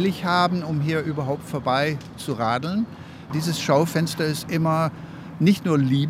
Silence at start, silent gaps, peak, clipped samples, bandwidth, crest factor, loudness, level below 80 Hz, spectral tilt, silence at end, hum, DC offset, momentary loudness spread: 0 s; none; -6 dBFS; under 0.1%; 16 kHz; 18 dB; -23 LUFS; -58 dBFS; -6 dB/octave; 0 s; none; under 0.1%; 10 LU